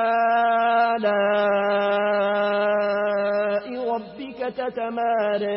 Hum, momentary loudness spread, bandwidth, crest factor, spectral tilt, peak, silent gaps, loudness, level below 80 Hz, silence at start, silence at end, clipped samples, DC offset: none; 8 LU; 5.8 kHz; 12 dB; -9.5 dB/octave; -10 dBFS; none; -22 LUFS; -64 dBFS; 0 s; 0 s; under 0.1%; under 0.1%